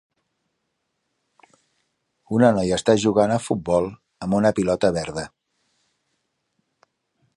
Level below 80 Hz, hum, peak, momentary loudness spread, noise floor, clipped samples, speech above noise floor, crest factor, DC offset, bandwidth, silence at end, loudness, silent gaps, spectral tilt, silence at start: -52 dBFS; none; -2 dBFS; 13 LU; -76 dBFS; under 0.1%; 56 dB; 22 dB; under 0.1%; 11.5 kHz; 2.1 s; -21 LUFS; none; -6 dB/octave; 2.3 s